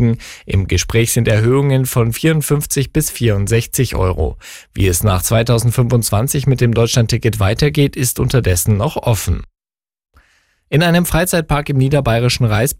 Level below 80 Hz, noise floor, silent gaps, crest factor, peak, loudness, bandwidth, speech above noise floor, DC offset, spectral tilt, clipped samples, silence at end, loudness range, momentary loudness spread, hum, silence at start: -30 dBFS; -57 dBFS; none; 12 dB; -2 dBFS; -15 LUFS; 16.5 kHz; 43 dB; under 0.1%; -5 dB/octave; under 0.1%; 0.05 s; 3 LU; 5 LU; none; 0 s